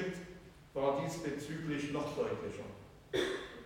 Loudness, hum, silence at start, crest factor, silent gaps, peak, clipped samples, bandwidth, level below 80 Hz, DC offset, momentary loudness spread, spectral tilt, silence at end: -39 LUFS; none; 0 s; 20 dB; none; -18 dBFS; under 0.1%; 16.5 kHz; -62 dBFS; under 0.1%; 15 LU; -5.5 dB/octave; 0 s